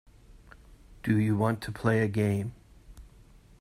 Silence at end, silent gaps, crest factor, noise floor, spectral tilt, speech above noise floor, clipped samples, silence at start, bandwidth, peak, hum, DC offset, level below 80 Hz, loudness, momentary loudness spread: 0.55 s; none; 20 dB; -55 dBFS; -8 dB/octave; 28 dB; under 0.1%; 0.3 s; 14.5 kHz; -10 dBFS; none; under 0.1%; -54 dBFS; -28 LUFS; 8 LU